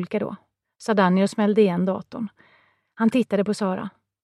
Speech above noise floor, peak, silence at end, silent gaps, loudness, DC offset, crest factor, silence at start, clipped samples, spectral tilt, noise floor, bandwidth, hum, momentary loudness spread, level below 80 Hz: 39 dB; -4 dBFS; 0.35 s; none; -22 LUFS; under 0.1%; 18 dB; 0 s; under 0.1%; -7 dB/octave; -61 dBFS; 11.5 kHz; none; 15 LU; -70 dBFS